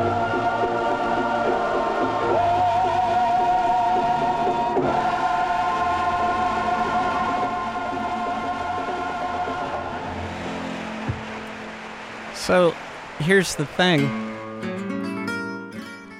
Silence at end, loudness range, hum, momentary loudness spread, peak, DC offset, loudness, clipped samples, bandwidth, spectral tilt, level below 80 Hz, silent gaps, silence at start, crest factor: 0 s; 7 LU; none; 12 LU; -6 dBFS; under 0.1%; -23 LUFS; under 0.1%; 14.5 kHz; -5 dB/octave; -48 dBFS; none; 0 s; 18 dB